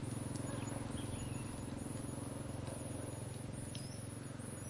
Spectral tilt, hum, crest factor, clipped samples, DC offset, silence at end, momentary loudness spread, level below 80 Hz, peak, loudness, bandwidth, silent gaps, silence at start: -5.5 dB/octave; none; 14 dB; under 0.1%; under 0.1%; 0 s; 4 LU; -60 dBFS; -30 dBFS; -45 LUFS; 11.5 kHz; none; 0 s